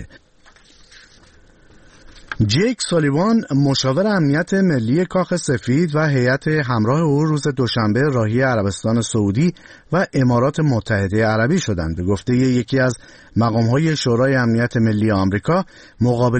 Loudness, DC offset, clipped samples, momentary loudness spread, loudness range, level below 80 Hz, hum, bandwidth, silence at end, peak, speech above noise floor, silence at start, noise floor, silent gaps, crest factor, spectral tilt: -18 LUFS; under 0.1%; under 0.1%; 4 LU; 1 LU; -44 dBFS; none; 8.8 kHz; 0 s; -6 dBFS; 33 dB; 0 s; -50 dBFS; none; 12 dB; -6 dB/octave